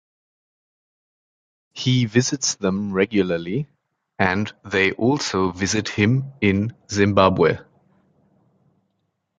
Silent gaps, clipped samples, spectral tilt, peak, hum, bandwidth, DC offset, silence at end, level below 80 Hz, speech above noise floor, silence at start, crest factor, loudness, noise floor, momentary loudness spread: none; under 0.1%; -5 dB/octave; -2 dBFS; none; 9.4 kHz; under 0.1%; 1.75 s; -48 dBFS; 53 dB; 1.75 s; 20 dB; -21 LUFS; -73 dBFS; 9 LU